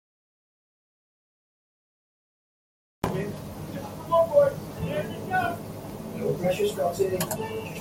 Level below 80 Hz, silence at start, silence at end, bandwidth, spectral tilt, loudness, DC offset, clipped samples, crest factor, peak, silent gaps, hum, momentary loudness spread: -54 dBFS; 3.05 s; 0 s; 17 kHz; -5.5 dB/octave; -27 LUFS; under 0.1%; under 0.1%; 20 dB; -8 dBFS; none; none; 15 LU